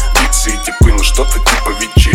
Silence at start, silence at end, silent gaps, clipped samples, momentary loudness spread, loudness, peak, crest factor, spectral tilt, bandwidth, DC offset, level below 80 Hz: 0 s; 0 s; none; 0.5%; 3 LU; -12 LUFS; 0 dBFS; 10 dB; -3.5 dB/octave; 16.5 kHz; under 0.1%; -12 dBFS